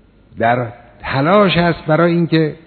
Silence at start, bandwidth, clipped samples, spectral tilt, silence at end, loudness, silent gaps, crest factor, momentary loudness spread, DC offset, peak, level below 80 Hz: 0.35 s; 4.6 kHz; under 0.1%; -10 dB/octave; 0.1 s; -15 LUFS; none; 16 dB; 10 LU; under 0.1%; 0 dBFS; -44 dBFS